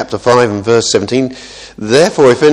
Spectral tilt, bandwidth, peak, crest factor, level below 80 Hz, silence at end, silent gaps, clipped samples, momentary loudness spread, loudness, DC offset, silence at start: -4.5 dB/octave; 12 kHz; 0 dBFS; 10 dB; -46 dBFS; 0 s; none; 0.7%; 16 LU; -11 LUFS; under 0.1%; 0 s